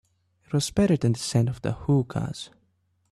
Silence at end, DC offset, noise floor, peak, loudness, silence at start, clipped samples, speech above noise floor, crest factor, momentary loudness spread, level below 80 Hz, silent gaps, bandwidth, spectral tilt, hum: 0.65 s; under 0.1%; -69 dBFS; -8 dBFS; -25 LUFS; 0.5 s; under 0.1%; 45 dB; 18 dB; 11 LU; -52 dBFS; none; 13 kHz; -6 dB/octave; none